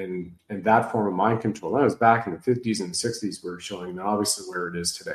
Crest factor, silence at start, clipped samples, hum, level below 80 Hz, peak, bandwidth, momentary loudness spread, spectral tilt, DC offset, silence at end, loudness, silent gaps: 20 dB; 0 s; under 0.1%; none; -62 dBFS; -4 dBFS; 13 kHz; 13 LU; -4.5 dB/octave; under 0.1%; 0 s; -25 LUFS; none